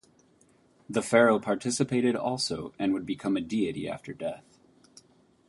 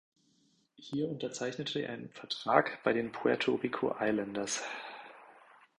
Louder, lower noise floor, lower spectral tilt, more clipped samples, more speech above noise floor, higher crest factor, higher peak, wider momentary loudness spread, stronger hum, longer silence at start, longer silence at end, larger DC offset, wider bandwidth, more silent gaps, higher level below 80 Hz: first, -28 LUFS vs -34 LUFS; second, -63 dBFS vs -71 dBFS; about the same, -4.5 dB/octave vs -4 dB/octave; neither; about the same, 35 dB vs 38 dB; about the same, 24 dB vs 26 dB; about the same, -6 dBFS vs -8 dBFS; about the same, 14 LU vs 15 LU; neither; about the same, 0.9 s vs 0.8 s; first, 1.1 s vs 0.4 s; neither; about the same, 11.5 kHz vs 11.5 kHz; neither; first, -64 dBFS vs -72 dBFS